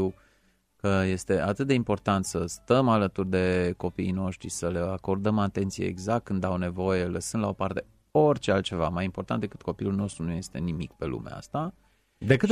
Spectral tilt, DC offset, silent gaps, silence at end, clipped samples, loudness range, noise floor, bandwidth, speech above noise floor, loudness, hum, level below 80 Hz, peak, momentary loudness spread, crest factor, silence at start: -6 dB/octave; under 0.1%; none; 0 s; under 0.1%; 4 LU; -66 dBFS; 14 kHz; 39 dB; -28 LUFS; none; -52 dBFS; -8 dBFS; 9 LU; 20 dB; 0 s